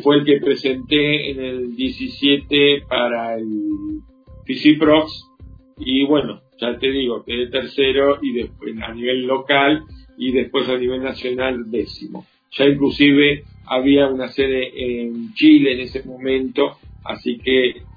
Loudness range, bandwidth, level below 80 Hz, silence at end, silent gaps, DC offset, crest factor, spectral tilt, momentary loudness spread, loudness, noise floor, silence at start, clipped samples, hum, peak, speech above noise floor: 3 LU; 5 kHz; -46 dBFS; 0.05 s; none; under 0.1%; 18 dB; -7.5 dB/octave; 14 LU; -18 LUFS; -42 dBFS; 0 s; under 0.1%; none; 0 dBFS; 25 dB